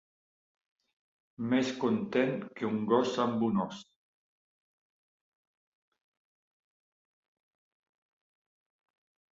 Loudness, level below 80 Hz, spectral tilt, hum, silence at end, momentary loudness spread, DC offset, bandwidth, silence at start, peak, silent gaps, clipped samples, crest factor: -31 LUFS; -76 dBFS; -6 dB/octave; none; 5.55 s; 9 LU; under 0.1%; 7.8 kHz; 1.4 s; -14 dBFS; none; under 0.1%; 22 dB